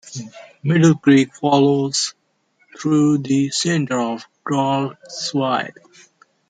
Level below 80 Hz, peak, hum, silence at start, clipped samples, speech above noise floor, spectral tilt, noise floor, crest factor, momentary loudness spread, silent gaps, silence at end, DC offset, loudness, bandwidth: -64 dBFS; -2 dBFS; none; 0.05 s; under 0.1%; 45 dB; -5 dB/octave; -63 dBFS; 16 dB; 13 LU; none; 0.8 s; under 0.1%; -18 LUFS; 9.4 kHz